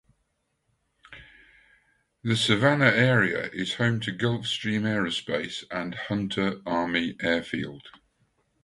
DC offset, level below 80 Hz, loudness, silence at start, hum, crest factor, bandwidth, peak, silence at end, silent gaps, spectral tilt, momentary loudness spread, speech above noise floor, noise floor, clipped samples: under 0.1%; -60 dBFS; -26 LUFS; 1.1 s; none; 24 dB; 11.5 kHz; -4 dBFS; 0.75 s; none; -5.5 dB/octave; 13 LU; 49 dB; -75 dBFS; under 0.1%